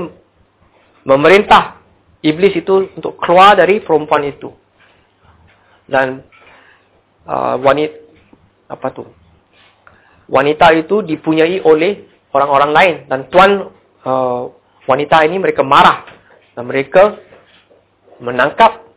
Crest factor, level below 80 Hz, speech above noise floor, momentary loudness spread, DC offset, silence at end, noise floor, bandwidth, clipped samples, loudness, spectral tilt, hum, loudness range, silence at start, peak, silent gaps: 14 dB; -48 dBFS; 41 dB; 19 LU; under 0.1%; 0.2 s; -53 dBFS; 4 kHz; 0.3%; -12 LUFS; -9 dB/octave; none; 9 LU; 0 s; 0 dBFS; none